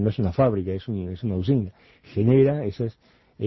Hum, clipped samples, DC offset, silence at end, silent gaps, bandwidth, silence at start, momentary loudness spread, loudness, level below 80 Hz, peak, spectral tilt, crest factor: none; under 0.1%; under 0.1%; 0 s; none; 6 kHz; 0 s; 13 LU; -24 LUFS; -42 dBFS; -8 dBFS; -11 dB/octave; 16 dB